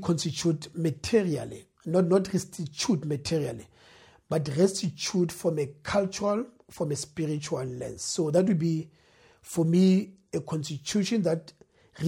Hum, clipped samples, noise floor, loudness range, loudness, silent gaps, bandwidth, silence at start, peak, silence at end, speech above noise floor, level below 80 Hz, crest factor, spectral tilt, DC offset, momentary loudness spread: none; under 0.1%; -56 dBFS; 3 LU; -28 LUFS; none; 16.5 kHz; 0 s; -10 dBFS; 0 s; 29 dB; -60 dBFS; 18 dB; -5.5 dB/octave; under 0.1%; 11 LU